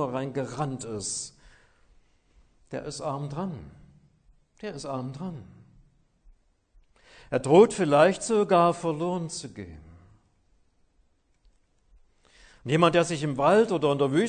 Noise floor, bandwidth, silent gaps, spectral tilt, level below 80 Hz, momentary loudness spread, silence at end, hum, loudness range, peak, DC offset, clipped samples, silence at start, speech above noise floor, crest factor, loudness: -66 dBFS; 9.6 kHz; none; -5.5 dB/octave; -60 dBFS; 19 LU; 0 s; none; 17 LU; -6 dBFS; under 0.1%; under 0.1%; 0 s; 41 dB; 22 dB; -25 LUFS